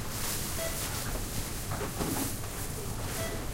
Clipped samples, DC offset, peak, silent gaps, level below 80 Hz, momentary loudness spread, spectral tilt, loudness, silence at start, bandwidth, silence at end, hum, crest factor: under 0.1%; under 0.1%; -16 dBFS; none; -40 dBFS; 4 LU; -3.5 dB/octave; -34 LUFS; 0 s; 16 kHz; 0 s; none; 18 dB